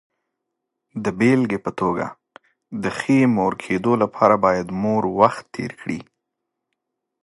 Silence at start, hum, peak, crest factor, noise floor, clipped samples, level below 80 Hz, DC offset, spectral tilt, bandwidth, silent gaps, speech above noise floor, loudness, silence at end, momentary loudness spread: 0.95 s; none; 0 dBFS; 20 dB; -80 dBFS; under 0.1%; -56 dBFS; under 0.1%; -7 dB/octave; 11.5 kHz; none; 61 dB; -20 LUFS; 1.2 s; 14 LU